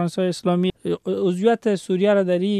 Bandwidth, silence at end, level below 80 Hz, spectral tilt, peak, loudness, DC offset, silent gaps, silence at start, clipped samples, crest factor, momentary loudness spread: 12 kHz; 0 s; -60 dBFS; -7 dB/octave; -6 dBFS; -21 LUFS; under 0.1%; none; 0 s; under 0.1%; 14 dB; 5 LU